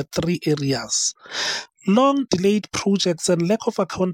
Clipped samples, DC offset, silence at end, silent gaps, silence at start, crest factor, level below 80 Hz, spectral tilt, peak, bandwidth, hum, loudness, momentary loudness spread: under 0.1%; under 0.1%; 0 s; none; 0 s; 16 dB; -54 dBFS; -4.5 dB/octave; -6 dBFS; 16.5 kHz; none; -21 LUFS; 6 LU